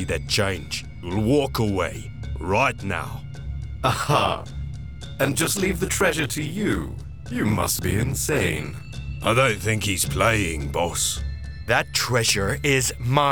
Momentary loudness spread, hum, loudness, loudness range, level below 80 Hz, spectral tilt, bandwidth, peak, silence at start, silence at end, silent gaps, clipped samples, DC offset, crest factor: 14 LU; none; -23 LUFS; 3 LU; -36 dBFS; -4 dB/octave; over 20 kHz; -4 dBFS; 0 s; 0 s; none; under 0.1%; 0.7%; 20 dB